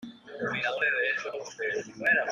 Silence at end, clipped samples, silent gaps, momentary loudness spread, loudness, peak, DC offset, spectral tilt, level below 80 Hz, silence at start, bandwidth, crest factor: 0 s; under 0.1%; none; 10 LU; -29 LUFS; -12 dBFS; under 0.1%; -3.5 dB/octave; -72 dBFS; 0 s; 11.5 kHz; 18 dB